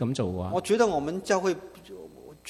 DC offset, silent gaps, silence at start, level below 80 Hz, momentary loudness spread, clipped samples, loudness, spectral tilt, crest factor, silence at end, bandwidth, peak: under 0.1%; none; 0 s; -52 dBFS; 21 LU; under 0.1%; -27 LUFS; -5.5 dB/octave; 18 dB; 0 s; 15 kHz; -10 dBFS